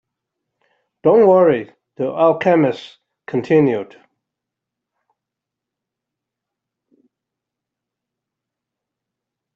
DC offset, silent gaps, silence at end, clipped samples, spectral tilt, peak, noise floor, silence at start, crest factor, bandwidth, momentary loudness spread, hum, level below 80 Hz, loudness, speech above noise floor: under 0.1%; none; 5.7 s; under 0.1%; -8.5 dB/octave; -2 dBFS; -84 dBFS; 1.05 s; 18 dB; 7.2 kHz; 15 LU; none; -66 dBFS; -16 LUFS; 69 dB